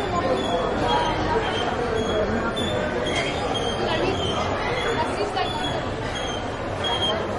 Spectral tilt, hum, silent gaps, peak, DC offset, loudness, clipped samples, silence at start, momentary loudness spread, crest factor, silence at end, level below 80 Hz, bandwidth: -4.5 dB/octave; none; none; -10 dBFS; under 0.1%; -24 LUFS; under 0.1%; 0 s; 5 LU; 14 dB; 0 s; -40 dBFS; 11.5 kHz